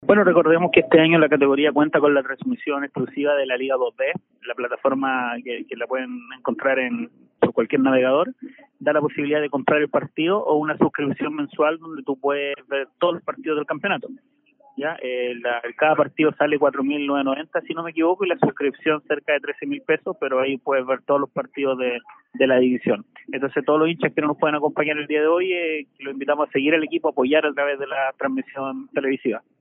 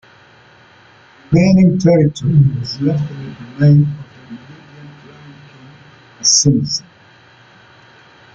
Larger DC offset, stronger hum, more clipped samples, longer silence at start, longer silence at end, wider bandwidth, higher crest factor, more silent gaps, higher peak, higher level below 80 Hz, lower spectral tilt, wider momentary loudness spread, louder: neither; neither; neither; second, 0 s vs 1.3 s; second, 0.2 s vs 1.55 s; second, 3.9 kHz vs 7.8 kHz; about the same, 20 dB vs 16 dB; neither; about the same, -2 dBFS vs 0 dBFS; second, -68 dBFS vs -46 dBFS; second, -1.5 dB/octave vs -5 dB/octave; second, 11 LU vs 21 LU; second, -21 LUFS vs -13 LUFS